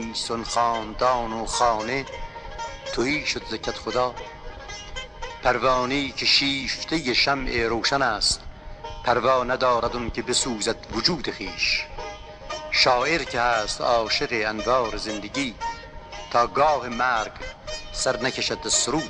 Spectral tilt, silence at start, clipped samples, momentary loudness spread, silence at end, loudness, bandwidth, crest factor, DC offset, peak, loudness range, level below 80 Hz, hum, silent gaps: -2.5 dB/octave; 0 s; under 0.1%; 15 LU; 0 s; -23 LUFS; 12 kHz; 18 dB; under 0.1%; -6 dBFS; 4 LU; -42 dBFS; none; none